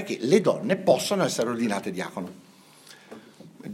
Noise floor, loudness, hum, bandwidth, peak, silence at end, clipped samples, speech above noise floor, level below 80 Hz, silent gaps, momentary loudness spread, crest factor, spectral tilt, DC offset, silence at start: -51 dBFS; -24 LUFS; none; 16 kHz; -6 dBFS; 0 s; under 0.1%; 27 dB; -72 dBFS; none; 22 LU; 22 dB; -5 dB/octave; under 0.1%; 0 s